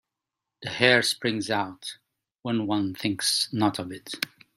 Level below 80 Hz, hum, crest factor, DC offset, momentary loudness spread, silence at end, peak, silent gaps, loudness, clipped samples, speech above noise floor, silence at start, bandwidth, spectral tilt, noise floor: -68 dBFS; none; 26 dB; under 0.1%; 17 LU; 0.3 s; -2 dBFS; none; -25 LUFS; under 0.1%; 61 dB; 0.6 s; 16 kHz; -3.5 dB/octave; -87 dBFS